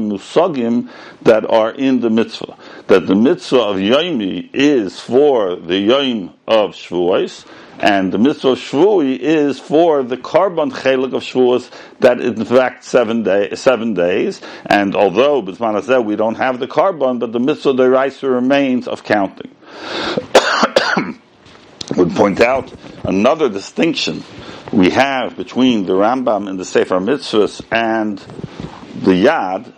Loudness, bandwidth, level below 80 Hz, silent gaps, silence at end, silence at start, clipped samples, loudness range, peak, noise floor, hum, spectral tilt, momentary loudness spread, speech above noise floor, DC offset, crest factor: -15 LUFS; 11 kHz; -56 dBFS; none; 0.1 s; 0 s; 0.1%; 2 LU; 0 dBFS; -43 dBFS; none; -5.5 dB/octave; 10 LU; 29 dB; under 0.1%; 14 dB